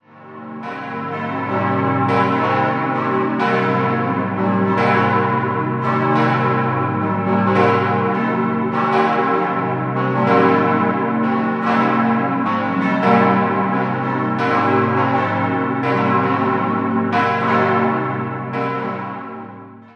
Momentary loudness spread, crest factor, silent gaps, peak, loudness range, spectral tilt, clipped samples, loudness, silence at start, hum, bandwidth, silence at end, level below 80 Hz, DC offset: 8 LU; 16 dB; none; -2 dBFS; 2 LU; -8.5 dB/octave; under 0.1%; -17 LUFS; 0.15 s; none; 6.8 kHz; 0.1 s; -58 dBFS; under 0.1%